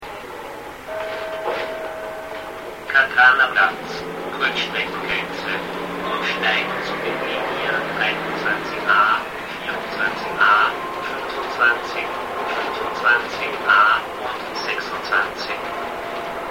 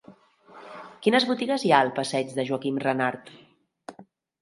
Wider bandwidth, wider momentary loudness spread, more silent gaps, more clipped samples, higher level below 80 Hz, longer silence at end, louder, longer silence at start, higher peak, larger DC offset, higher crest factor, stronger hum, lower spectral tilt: first, 16.5 kHz vs 11.5 kHz; second, 14 LU vs 24 LU; neither; neither; first, -54 dBFS vs -74 dBFS; second, 0 s vs 0.4 s; first, -20 LUFS vs -24 LUFS; about the same, 0 s vs 0.1 s; about the same, -2 dBFS vs -2 dBFS; first, 0.1% vs under 0.1%; second, 18 dB vs 24 dB; neither; about the same, -3.5 dB/octave vs -4.5 dB/octave